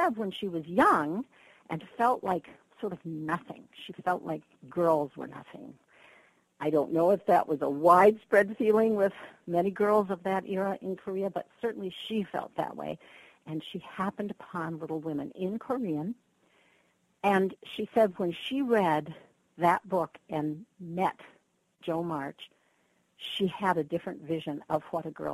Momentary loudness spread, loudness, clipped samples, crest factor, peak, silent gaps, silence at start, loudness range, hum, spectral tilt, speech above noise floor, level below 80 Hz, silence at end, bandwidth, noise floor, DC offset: 15 LU; -30 LUFS; under 0.1%; 22 dB; -8 dBFS; none; 0 s; 11 LU; none; -6.5 dB/octave; 41 dB; -70 dBFS; 0 s; 13 kHz; -71 dBFS; under 0.1%